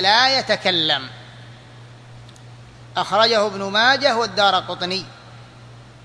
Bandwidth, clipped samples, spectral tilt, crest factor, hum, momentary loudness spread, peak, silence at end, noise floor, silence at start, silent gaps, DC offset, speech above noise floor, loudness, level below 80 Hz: 11 kHz; under 0.1%; -3 dB/octave; 20 dB; none; 13 LU; -2 dBFS; 0.2 s; -42 dBFS; 0 s; none; under 0.1%; 24 dB; -18 LUFS; -58 dBFS